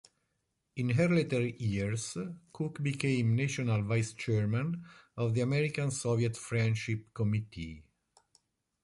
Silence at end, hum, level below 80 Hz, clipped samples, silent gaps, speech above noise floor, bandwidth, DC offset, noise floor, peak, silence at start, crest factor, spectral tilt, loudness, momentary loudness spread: 1.05 s; none; -60 dBFS; under 0.1%; none; 50 dB; 11.5 kHz; under 0.1%; -81 dBFS; -18 dBFS; 0.75 s; 14 dB; -6 dB/octave; -32 LUFS; 11 LU